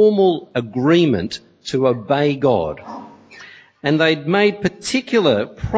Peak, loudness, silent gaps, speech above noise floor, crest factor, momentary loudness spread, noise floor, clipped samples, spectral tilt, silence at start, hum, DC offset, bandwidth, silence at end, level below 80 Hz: -2 dBFS; -18 LUFS; none; 25 dB; 16 dB; 12 LU; -42 dBFS; under 0.1%; -6 dB/octave; 0 s; none; under 0.1%; 8 kHz; 0 s; -44 dBFS